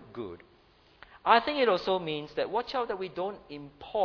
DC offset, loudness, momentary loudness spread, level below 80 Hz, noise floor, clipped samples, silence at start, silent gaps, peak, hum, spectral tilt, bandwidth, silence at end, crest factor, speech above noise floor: under 0.1%; -29 LUFS; 19 LU; -64 dBFS; -61 dBFS; under 0.1%; 0 s; none; -8 dBFS; none; -6 dB/octave; 5.4 kHz; 0 s; 24 dB; 32 dB